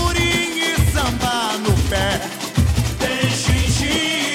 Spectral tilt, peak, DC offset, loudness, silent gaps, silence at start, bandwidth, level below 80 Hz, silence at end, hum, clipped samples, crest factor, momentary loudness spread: -4 dB/octave; -4 dBFS; under 0.1%; -18 LUFS; none; 0 s; 16.5 kHz; -26 dBFS; 0 s; none; under 0.1%; 14 dB; 3 LU